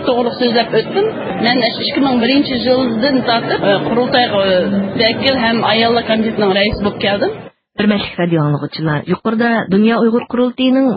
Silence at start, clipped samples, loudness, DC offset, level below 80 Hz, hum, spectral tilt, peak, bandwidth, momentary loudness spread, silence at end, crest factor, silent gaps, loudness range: 0 s; under 0.1%; -14 LUFS; under 0.1%; -44 dBFS; none; -9 dB/octave; 0 dBFS; 5.2 kHz; 5 LU; 0 s; 14 dB; none; 2 LU